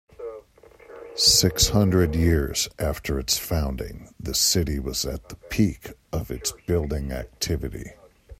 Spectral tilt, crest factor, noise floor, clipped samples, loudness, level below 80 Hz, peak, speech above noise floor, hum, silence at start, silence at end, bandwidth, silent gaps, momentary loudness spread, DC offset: -3.5 dB/octave; 20 dB; -51 dBFS; under 0.1%; -23 LUFS; -36 dBFS; -6 dBFS; 27 dB; none; 0.2 s; 0.05 s; 16 kHz; none; 19 LU; under 0.1%